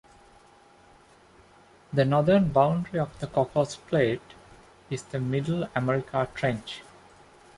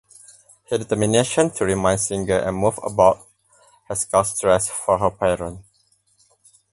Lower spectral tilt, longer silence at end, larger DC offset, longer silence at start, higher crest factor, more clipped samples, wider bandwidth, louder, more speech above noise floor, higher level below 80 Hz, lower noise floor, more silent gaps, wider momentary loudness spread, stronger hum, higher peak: first, -7 dB/octave vs -4.5 dB/octave; second, 0.75 s vs 1.1 s; neither; first, 1.9 s vs 0.7 s; about the same, 22 dB vs 20 dB; neither; about the same, 11.5 kHz vs 12 kHz; second, -26 LUFS vs -20 LUFS; second, 30 dB vs 43 dB; second, -56 dBFS vs -46 dBFS; second, -56 dBFS vs -63 dBFS; neither; first, 14 LU vs 9 LU; neither; second, -6 dBFS vs -2 dBFS